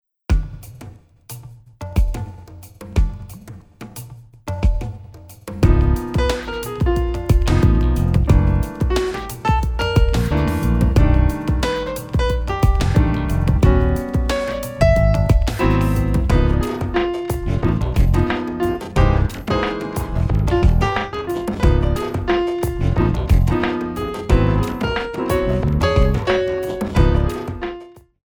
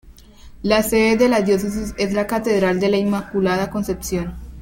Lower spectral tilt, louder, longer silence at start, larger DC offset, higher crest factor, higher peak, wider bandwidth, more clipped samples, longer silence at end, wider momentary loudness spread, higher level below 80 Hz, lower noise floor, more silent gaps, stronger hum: first, -7 dB/octave vs -5.5 dB/octave; about the same, -19 LUFS vs -19 LUFS; first, 0.3 s vs 0.05 s; neither; about the same, 16 dB vs 18 dB; about the same, 0 dBFS vs -2 dBFS; first, over 20 kHz vs 17 kHz; neither; first, 0.25 s vs 0 s; first, 14 LU vs 9 LU; first, -22 dBFS vs -40 dBFS; about the same, -40 dBFS vs -42 dBFS; neither; neither